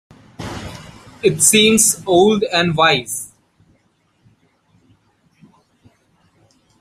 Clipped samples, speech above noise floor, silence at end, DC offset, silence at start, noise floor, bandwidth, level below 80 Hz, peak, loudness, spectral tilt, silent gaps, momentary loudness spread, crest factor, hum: under 0.1%; 47 dB; 3.55 s; under 0.1%; 0.4 s; -61 dBFS; 16 kHz; -52 dBFS; 0 dBFS; -13 LUFS; -2.5 dB/octave; none; 23 LU; 20 dB; none